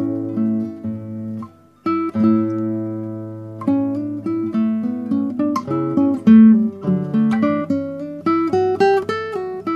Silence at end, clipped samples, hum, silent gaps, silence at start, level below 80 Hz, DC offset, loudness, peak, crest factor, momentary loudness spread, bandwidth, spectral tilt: 0 s; under 0.1%; none; none; 0 s; -64 dBFS; under 0.1%; -18 LUFS; -2 dBFS; 16 dB; 14 LU; 6.8 kHz; -8.5 dB/octave